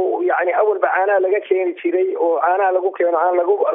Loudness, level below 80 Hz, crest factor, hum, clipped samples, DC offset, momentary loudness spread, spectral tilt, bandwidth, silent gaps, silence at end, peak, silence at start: -17 LUFS; -86 dBFS; 14 dB; none; under 0.1%; under 0.1%; 3 LU; -0.5 dB/octave; 3.7 kHz; none; 0 s; -2 dBFS; 0 s